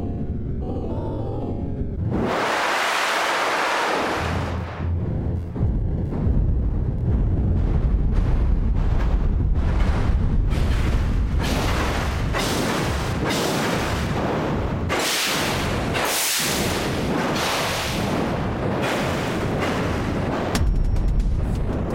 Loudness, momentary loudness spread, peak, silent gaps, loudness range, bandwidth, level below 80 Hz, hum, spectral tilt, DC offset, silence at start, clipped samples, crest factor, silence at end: -23 LUFS; 6 LU; -8 dBFS; none; 2 LU; 17 kHz; -26 dBFS; none; -5 dB/octave; under 0.1%; 0 s; under 0.1%; 14 dB; 0 s